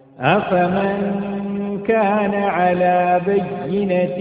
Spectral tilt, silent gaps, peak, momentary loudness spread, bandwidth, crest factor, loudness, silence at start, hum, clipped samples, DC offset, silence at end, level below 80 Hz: -12 dB/octave; none; 0 dBFS; 7 LU; 4.9 kHz; 18 dB; -18 LUFS; 0.2 s; none; under 0.1%; under 0.1%; 0 s; -52 dBFS